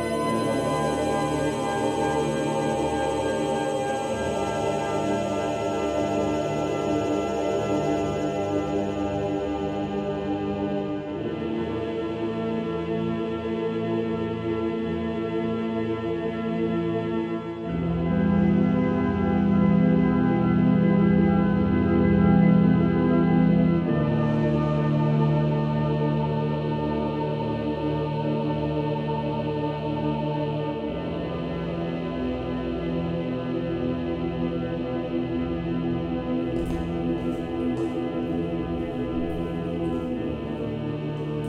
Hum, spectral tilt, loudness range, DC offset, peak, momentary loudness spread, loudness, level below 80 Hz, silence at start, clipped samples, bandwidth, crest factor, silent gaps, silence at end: none; -7.5 dB/octave; 8 LU; under 0.1%; -8 dBFS; 8 LU; -25 LUFS; -44 dBFS; 0 s; under 0.1%; 11 kHz; 16 dB; none; 0 s